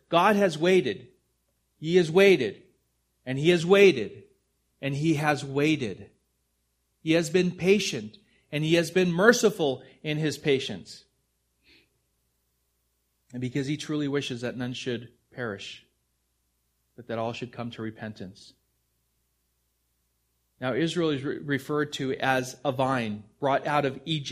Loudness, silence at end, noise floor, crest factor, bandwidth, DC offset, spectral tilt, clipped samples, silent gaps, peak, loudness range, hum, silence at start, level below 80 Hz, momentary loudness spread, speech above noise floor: -26 LUFS; 0 s; -74 dBFS; 24 dB; 15.5 kHz; under 0.1%; -5 dB/octave; under 0.1%; none; -2 dBFS; 15 LU; none; 0.1 s; -66 dBFS; 17 LU; 49 dB